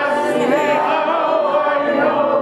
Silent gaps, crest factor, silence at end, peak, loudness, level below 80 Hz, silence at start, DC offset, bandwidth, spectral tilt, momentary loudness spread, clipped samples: none; 12 dB; 0 s; -4 dBFS; -16 LUFS; -60 dBFS; 0 s; under 0.1%; 12.5 kHz; -5 dB/octave; 1 LU; under 0.1%